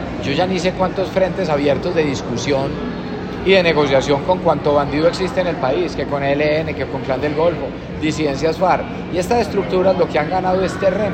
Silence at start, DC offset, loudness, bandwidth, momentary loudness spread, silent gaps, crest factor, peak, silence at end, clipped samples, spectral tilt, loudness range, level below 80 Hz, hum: 0 s; under 0.1%; -18 LUFS; 15 kHz; 7 LU; none; 16 dB; 0 dBFS; 0 s; under 0.1%; -6 dB/octave; 3 LU; -38 dBFS; none